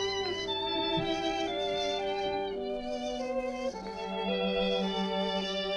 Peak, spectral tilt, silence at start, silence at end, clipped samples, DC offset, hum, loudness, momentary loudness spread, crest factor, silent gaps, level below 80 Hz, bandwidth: -18 dBFS; -4.5 dB/octave; 0 s; 0 s; under 0.1%; under 0.1%; none; -32 LUFS; 6 LU; 14 dB; none; -54 dBFS; 11 kHz